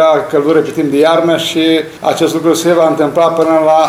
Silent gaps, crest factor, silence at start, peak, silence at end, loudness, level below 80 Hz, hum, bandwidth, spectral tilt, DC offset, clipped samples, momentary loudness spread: none; 10 dB; 0 s; 0 dBFS; 0 s; -11 LUFS; -54 dBFS; none; 16 kHz; -4.5 dB/octave; under 0.1%; under 0.1%; 4 LU